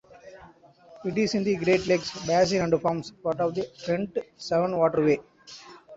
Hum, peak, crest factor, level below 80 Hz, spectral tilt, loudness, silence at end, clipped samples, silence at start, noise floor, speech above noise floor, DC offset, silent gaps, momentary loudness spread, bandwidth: none; -8 dBFS; 18 dB; -60 dBFS; -5.5 dB/octave; -26 LUFS; 0 s; under 0.1%; 0.25 s; -53 dBFS; 27 dB; under 0.1%; none; 12 LU; 8 kHz